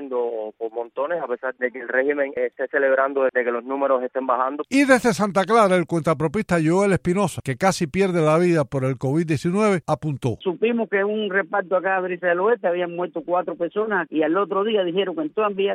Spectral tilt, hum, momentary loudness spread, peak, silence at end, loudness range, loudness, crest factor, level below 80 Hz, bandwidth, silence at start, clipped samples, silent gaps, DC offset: -6 dB/octave; none; 8 LU; -2 dBFS; 0 s; 3 LU; -21 LUFS; 20 dB; -56 dBFS; 15.5 kHz; 0 s; under 0.1%; none; under 0.1%